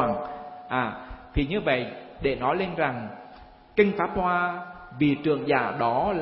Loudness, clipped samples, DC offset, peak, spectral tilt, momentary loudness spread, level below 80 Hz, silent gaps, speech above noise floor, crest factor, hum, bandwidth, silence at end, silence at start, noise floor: -26 LUFS; under 0.1%; under 0.1%; -6 dBFS; -10.5 dB/octave; 14 LU; -44 dBFS; none; 24 dB; 20 dB; none; 5.8 kHz; 0 s; 0 s; -49 dBFS